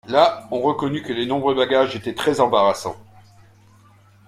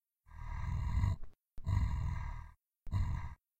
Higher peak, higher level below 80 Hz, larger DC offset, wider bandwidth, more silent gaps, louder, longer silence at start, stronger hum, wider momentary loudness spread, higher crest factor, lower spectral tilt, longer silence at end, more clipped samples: first, -2 dBFS vs -20 dBFS; second, -58 dBFS vs -42 dBFS; neither; first, 15 kHz vs 8.4 kHz; neither; first, -20 LUFS vs -39 LUFS; second, 0.05 s vs 0.3 s; neither; second, 8 LU vs 16 LU; about the same, 20 dB vs 16 dB; second, -5 dB/octave vs -7.5 dB/octave; first, 1.25 s vs 0.25 s; neither